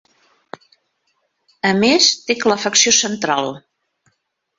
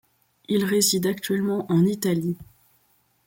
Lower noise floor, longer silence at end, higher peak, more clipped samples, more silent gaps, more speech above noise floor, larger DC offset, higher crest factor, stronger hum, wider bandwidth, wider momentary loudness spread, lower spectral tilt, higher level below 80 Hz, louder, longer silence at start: first, -69 dBFS vs -65 dBFS; first, 1 s vs 0.85 s; first, 0 dBFS vs -6 dBFS; neither; neither; first, 53 dB vs 43 dB; neither; about the same, 20 dB vs 18 dB; neither; second, 8 kHz vs 17 kHz; about the same, 9 LU vs 7 LU; second, -1.5 dB/octave vs -4.5 dB/octave; about the same, -60 dBFS vs -62 dBFS; first, -15 LUFS vs -23 LUFS; first, 1.65 s vs 0.5 s